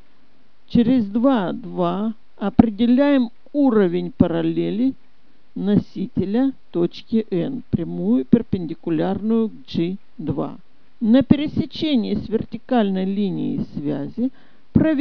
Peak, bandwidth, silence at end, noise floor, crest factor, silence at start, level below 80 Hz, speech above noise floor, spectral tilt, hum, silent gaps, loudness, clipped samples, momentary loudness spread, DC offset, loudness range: 0 dBFS; 5.4 kHz; 0 s; -60 dBFS; 20 dB; 0.7 s; -46 dBFS; 40 dB; -9.5 dB/octave; none; none; -21 LUFS; under 0.1%; 9 LU; 1%; 4 LU